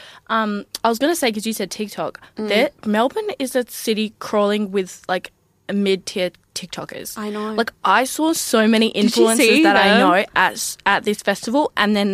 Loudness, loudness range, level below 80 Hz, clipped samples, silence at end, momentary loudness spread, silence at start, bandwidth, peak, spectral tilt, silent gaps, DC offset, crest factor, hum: -18 LUFS; 8 LU; -60 dBFS; under 0.1%; 0 s; 13 LU; 0 s; 15.5 kHz; -2 dBFS; -3.5 dB/octave; none; under 0.1%; 18 dB; none